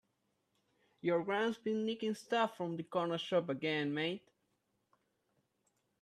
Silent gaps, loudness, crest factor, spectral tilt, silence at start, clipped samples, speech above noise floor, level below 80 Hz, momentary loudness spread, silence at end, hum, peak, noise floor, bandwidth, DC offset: none; -37 LUFS; 18 dB; -6 dB/octave; 1.05 s; under 0.1%; 45 dB; -84 dBFS; 5 LU; 1.85 s; none; -20 dBFS; -81 dBFS; 13.5 kHz; under 0.1%